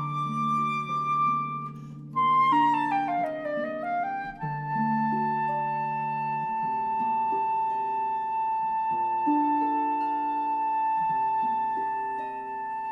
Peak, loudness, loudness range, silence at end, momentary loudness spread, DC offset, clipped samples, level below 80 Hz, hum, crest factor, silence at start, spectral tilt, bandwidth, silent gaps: -14 dBFS; -27 LUFS; 3 LU; 0 s; 8 LU; under 0.1%; under 0.1%; -66 dBFS; none; 14 dB; 0 s; -7 dB/octave; 7.6 kHz; none